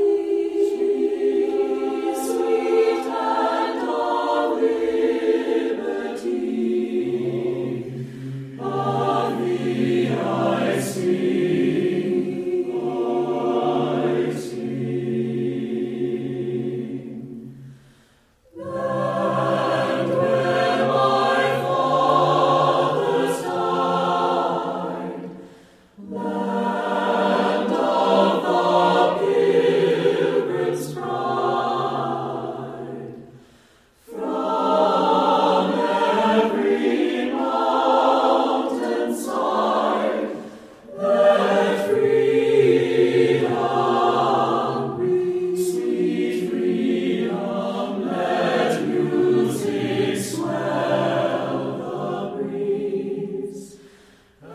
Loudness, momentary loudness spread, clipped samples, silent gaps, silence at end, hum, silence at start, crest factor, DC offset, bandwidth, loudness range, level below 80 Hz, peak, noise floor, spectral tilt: -21 LUFS; 10 LU; under 0.1%; none; 0 s; none; 0 s; 18 dB; under 0.1%; 15 kHz; 7 LU; -64 dBFS; -4 dBFS; -57 dBFS; -6 dB/octave